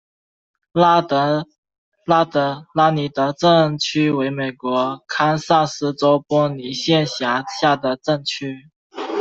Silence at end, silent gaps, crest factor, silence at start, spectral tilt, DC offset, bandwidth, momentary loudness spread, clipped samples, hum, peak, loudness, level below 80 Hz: 0 s; 1.58-1.63 s, 1.78-1.92 s, 8.76-8.90 s; 16 dB; 0.75 s; -5.5 dB/octave; under 0.1%; 8 kHz; 10 LU; under 0.1%; none; -2 dBFS; -18 LUFS; -60 dBFS